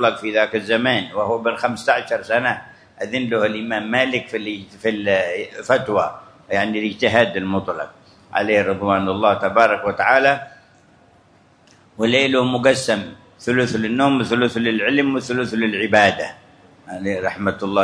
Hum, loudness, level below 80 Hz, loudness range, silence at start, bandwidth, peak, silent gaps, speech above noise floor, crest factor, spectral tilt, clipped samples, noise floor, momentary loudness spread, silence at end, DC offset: none; -19 LUFS; -58 dBFS; 3 LU; 0 s; 11 kHz; 0 dBFS; none; 34 dB; 20 dB; -5 dB/octave; under 0.1%; -53 dBFS; 10 LU; 0 s; under 0.1%